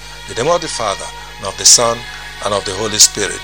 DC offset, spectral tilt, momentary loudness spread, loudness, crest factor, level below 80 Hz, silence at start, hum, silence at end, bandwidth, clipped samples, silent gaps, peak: 1%; -0.5 dB/octave; 18 LU; -12 LUFS; 16 dB; -40 dBFS; 0 s; 50 Hz at -40 dBFS; 0 s; over 20 kHz; 0.4%; none; 0 dBFS